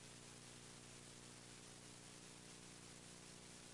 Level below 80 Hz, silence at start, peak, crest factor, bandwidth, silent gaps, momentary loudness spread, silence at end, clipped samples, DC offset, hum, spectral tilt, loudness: -78 dBFS; 0 s; -46 dBFS; 14 dB; 12 kHz; none; 0 LU; 0 s; under 0.1%; under 0.1%; 60 Hz at -65 dBFS; -2.5 dB/octave; -58 LUFS